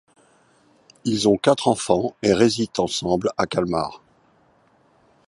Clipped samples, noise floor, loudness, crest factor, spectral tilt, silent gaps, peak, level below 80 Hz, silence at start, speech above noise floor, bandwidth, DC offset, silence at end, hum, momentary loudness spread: under 0.1%; -59 dBFS; -21 LUFS; 20 dB; -5 dB/octave; none; -2 dBFS; -52 dBFS; 1.05 s; 39 dB; 11.5 kHz; under 0.1%; 1.3 s; none; 8 LU